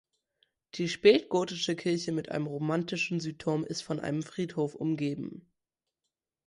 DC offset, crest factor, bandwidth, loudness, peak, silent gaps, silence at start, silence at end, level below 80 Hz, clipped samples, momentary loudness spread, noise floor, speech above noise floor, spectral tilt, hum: under 0.1%; 22 dB; 11.5 kHz; -30 LUFS; -8 dBFS; none; 0.75 s; 1.1 s; -70 dBFS; under 0.1%; 11 LU; -88 dBFS; 58 dB; -5.5 dB/octave; none